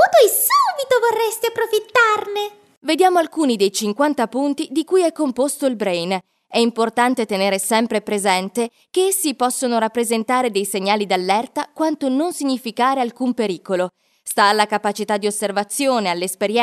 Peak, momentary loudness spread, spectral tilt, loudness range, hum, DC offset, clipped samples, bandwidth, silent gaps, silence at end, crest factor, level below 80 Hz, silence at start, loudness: 0 dBFS; 7 LU; -3 dB/octave; 2 LU; none; under 0.1%; under 0.1%; 13.5 kHz; 2.77-2.81 s; 0 s; 18 dB; -72 dBFS; 0 s; -19 LUFS